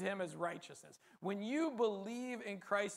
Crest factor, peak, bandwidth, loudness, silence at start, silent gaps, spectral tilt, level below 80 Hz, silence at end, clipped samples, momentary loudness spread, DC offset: 18 dB; -22 dBFS; 15 kHz; -41 LUFS; 0 s; none; -5 dB/octave; -90 dBFS; 0 s; under 0.1%; 12 LU; under 0.1%